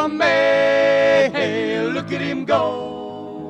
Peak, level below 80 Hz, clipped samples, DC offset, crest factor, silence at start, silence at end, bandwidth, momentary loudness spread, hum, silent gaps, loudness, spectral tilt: -6 dBFS; -58 dBFS; under 0.1%; under 0.1%; 14 dB; 0 s; 0 s; 8.8 kHz; 13 LU; none; none; -18 LUFS; -5 dB/octave